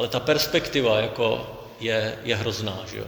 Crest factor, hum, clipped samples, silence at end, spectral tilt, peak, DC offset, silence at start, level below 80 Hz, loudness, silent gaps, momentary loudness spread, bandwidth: 20 dB; none; under 0.1%; 0 s; -4.5 dB/octave; -6 dBFS; under 0.1%; 0 s; -52 dBFS; -24 LUFS; none; 9 LU; over 20 kHz